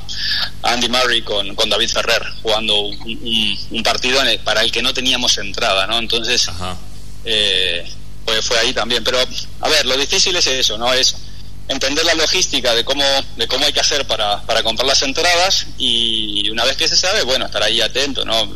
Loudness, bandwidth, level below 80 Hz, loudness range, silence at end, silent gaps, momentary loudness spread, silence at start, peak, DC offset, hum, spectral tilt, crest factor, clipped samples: -15 LUFS; 13.5 kHz; -36 dBFS; 2 LU; 0 s; none; 6 LU; 0 s; -2 dBFS; 6%; 50 Hz at -35 dBFS; -1 dB/octave; 16 dB; under 0.1%